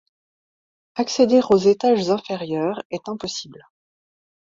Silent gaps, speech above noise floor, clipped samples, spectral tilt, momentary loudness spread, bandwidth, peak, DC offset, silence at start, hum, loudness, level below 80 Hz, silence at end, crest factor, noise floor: 2.85-2.90 s; over 70 dB; under 0.1%; -5 dB/octave; 15 LU; 7.8 kHz; -4 dBFS; under 0.1%; 0.95 s; none; -20 LUFS; -62 dBFS; 0.9 s; 18 dB; under -90 dBFS